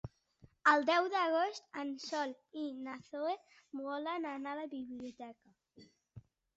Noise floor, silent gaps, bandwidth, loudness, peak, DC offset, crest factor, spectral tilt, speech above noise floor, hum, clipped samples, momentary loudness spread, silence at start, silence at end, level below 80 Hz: -66 dBFS; none; 8 kHz; -36 LUFS; -14 dBFS; under 0.1%; 24 dB; -2 dB/octave; 30 dB; none; under 0.1%; 17 LU; 0.05 s; 0.35 s; -74 dBFS